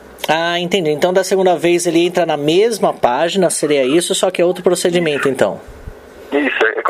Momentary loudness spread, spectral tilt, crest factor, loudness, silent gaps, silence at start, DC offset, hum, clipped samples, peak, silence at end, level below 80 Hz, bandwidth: 3 LU; -4 dB/octave; 14 dB; -15 LUFS; none; 0.05 s; under 0.1%; none; under 0.1%; 0 dBFS; 0 s; -48 dBFS; 16 kHz